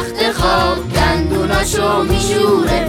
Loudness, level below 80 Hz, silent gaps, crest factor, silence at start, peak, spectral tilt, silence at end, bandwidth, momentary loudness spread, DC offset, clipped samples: -14 LUFS; -26 dBFS; none; 14 dB; 0 s; -2 dBFS; -4.5 dB/octave; 0 s; 17 kHz; 3 LU; under 0.1%; under 0.1%